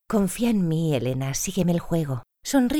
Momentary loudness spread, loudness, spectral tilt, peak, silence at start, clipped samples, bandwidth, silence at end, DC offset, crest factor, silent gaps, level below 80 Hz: 4 LU; -24 LUFS; -5.5 dB/octave; -8 dBFS; 0.1 s; under 0.1%; 18 kHz; 0 s; under 0.1%; 16 dB; none; -46 dBFS